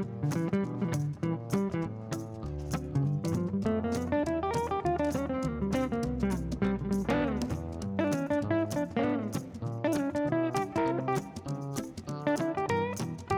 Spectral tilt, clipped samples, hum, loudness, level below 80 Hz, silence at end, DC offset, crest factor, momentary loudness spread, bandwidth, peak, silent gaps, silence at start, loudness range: -7 dB/octave; under 0.1%; none; -32 LUFS; -50 dBFS; 0 s; under 0.1%; 16 dB; 7 LU; 18.5 kHz; -16 dBFS; none; 0 s; 2 LU